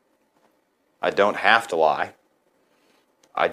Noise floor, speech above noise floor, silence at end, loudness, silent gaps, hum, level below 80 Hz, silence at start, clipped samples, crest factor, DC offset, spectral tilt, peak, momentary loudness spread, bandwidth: -67 dBFS; 47 dB; 0 s; -21 LUFS; none; none; -72 dBFS; 1 s; under 0.1%; 24 dB; under 0.1%; -3.5 dB/octave; -2 dBFS; 12 LU; 15.5 kHz